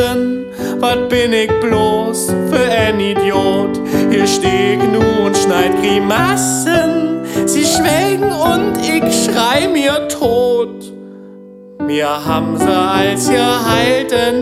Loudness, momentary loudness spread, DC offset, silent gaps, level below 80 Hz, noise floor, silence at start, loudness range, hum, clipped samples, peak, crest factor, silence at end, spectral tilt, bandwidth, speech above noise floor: -13 LUFS; 5 LU; under 0.1%; none; -40 dBFS; -35 dBFS; 0 s; 3 LU; none; under 0.1%; -2 dBFS; 12 dB; 0 s; -4 dB/octave; 16.5 kHz; 22 dB